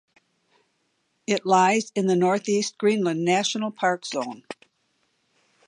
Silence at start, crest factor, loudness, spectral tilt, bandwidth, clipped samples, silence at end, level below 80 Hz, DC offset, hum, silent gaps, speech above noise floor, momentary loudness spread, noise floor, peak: 1.3 s; 20 dB; -23 LUFS; -4.5 dB/octave; 11 kHz; under 0.1%; 1.15 s; -76 dBFS; under 0.1%; none; none; 49 dB; 17 LU; -72 dBFS; -6 dBFS